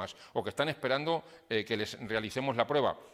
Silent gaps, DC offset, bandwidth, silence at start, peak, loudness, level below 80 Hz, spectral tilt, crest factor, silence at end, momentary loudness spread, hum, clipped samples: none; under 0.1%; 16 kHz; 0 s; -10 dBFS; -33 LUFS; -68 dBFS; -5 dB/octave; 22 dB; 0.05 s; 7 LU; none; under 0.1%